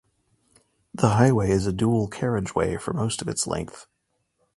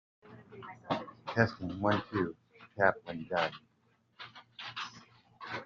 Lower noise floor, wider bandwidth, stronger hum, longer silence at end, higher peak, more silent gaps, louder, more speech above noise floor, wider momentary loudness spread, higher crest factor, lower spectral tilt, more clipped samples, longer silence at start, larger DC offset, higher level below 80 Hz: about the same, -74 dBFS vs -72 dBFS; first, 11.5 kHz vs 7.4 kHz; neither; first, 0.75 s vs 0 s; first, -4 dBFS vs -10 dBFS; neither; first, -24 LUFS vs -34 LUFS; first, 51 dB vs 40 dB; second, 9 LU vs 20 LU; about the same, 22 dB vs 26 dB; first, -6 dB/octave vs -4 dB/octave; neither; first, 0.95 s vs 0.25 s; neither; first, -46 dBFS vs -70 dBFS